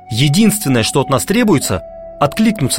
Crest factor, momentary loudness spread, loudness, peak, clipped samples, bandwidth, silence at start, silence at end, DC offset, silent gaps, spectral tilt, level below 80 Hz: 14 dB; 8 LU; -14 LUFS; 0 dBFS; under 0.1%; 16.5 kHz; 0.05 s; 0 s; under 0.1%; none; -4.5 dB/octave; -40 dBFS